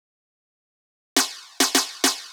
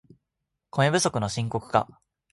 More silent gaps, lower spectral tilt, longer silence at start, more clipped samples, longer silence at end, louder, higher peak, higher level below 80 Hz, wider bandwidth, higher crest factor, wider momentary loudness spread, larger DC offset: neither; second, 1 dB/octave vs -4.5 dB/octave; first, 1.15 s vs 0.75 s; neither; second, 0 s vs 0.5 s; first, -21 LUFS vs -25 LUFS; about the same, -4 dBFS vs -6 dBFS; second, -68 dBFS vs -58 dBFS; first, over 20 kHz vs 11.5 kHz; about the same, 22 dB vs 22 dB; second, 5 LU vs 10 LU; neither